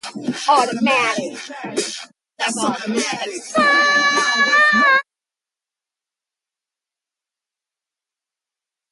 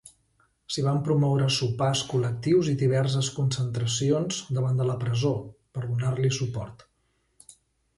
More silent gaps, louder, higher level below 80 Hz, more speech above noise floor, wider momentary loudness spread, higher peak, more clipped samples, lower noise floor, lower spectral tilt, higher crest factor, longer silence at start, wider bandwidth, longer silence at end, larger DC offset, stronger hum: neither; first, -16 LUFS vs -26 LUFS; second, -68 dBFS vs -58 dBFS; first, 71 dB vs 46 dB; first, 14 LU vs 9 LU; first, -4 dBFS vs -12 dBFS; neither; first, -89 dBFS vs -71 dBFS; second, -2 dB/octave vs -5.5 dB/octave; about the same, 16 dB vs 14 dB; second, 0.05 s vs 0.7 s; about the same, 11.5 kHz vs 11.5 kHz; first, 3.9 s vs 1.2 s; neither; neither